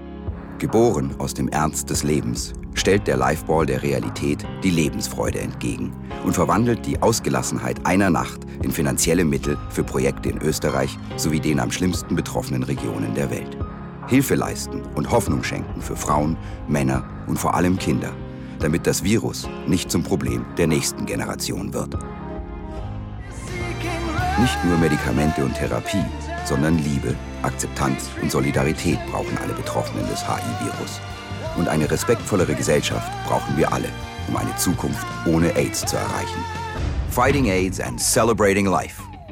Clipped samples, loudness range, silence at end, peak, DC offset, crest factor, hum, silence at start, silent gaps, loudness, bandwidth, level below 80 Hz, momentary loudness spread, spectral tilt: under 0.1%; 3 LU; 0 s; -6 dBFS; under 0.1%; 16 dB; none; 0 s; none; -22 LUFS; 17.5 kHz; -36 dBFS; 10 LU; -5 dB/octave